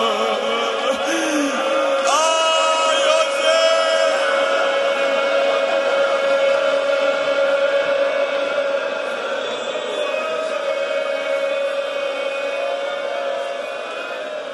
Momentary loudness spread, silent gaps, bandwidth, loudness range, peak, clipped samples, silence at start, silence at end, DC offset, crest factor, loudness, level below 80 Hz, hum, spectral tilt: 8 LU; none; 11.5 kHz; 6 LU; -4 dBFS; under 0.1%; 0 s; 0 s; under 0.1%; 16 dB; -19 LUFS; -72 dBFS; none; -1 dB/octave